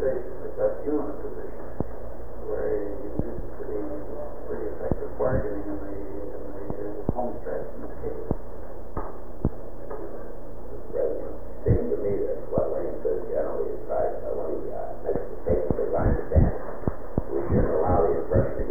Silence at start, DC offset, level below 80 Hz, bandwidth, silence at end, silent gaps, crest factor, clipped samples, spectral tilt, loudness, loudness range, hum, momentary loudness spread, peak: 0 s; 5%; -36 dBFS; over 20 kHz; 0 s; none; 20 dB; under 0.1%; -11 dB/octave; -29 LUFS; 8 LU; 60 Hz at -50 dBFS; 14 LU; -6 dBFS